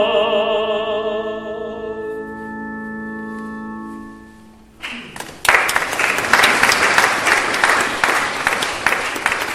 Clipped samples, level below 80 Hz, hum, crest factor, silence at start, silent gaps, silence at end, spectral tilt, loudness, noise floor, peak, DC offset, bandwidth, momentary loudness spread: under 0.1%; -48 dBFS; none; 18 dB; 0 s; none; 0 s; -1.5 dB/octave; -16 LUFS; -43 dBFS; 0 dBFS; under 0.1%; 16.5 kHz; 17 LU